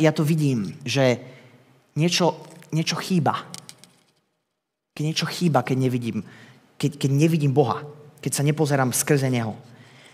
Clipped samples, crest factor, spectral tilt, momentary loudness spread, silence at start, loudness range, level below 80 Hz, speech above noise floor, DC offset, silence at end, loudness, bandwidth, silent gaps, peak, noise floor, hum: under 0.1%; 20 dB; -5.5 dB/octave; 13 LU; 0 s; 4 LU; -72 dBFS; 58 dB; under 0.1%; 0.3 s; -23 LUFS; 16 kHz; none; -4 dBFS; -80 dBFS; none